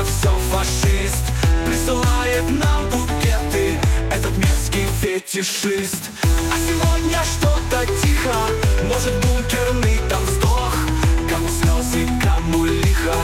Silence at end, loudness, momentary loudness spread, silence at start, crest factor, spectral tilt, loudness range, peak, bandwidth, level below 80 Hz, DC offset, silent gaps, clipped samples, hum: 0 s; -19 LUFS; 2 LU; 0 s; 12 dB; -4.5 dB/octave; 1 LU; -6 dBFS; 17 kHz; -22 dBFS; under 0.1%; none; under 0.1%; none